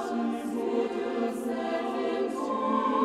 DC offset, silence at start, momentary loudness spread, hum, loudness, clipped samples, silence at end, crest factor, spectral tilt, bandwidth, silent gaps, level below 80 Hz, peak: under 0.1%; 0 s; 3 LU; none; -30 LUFS; under 0.1%; 0 s; 16 dB; -5.5 dB/octave; 14 kHz; none; -70 dBFS; -14 dBFS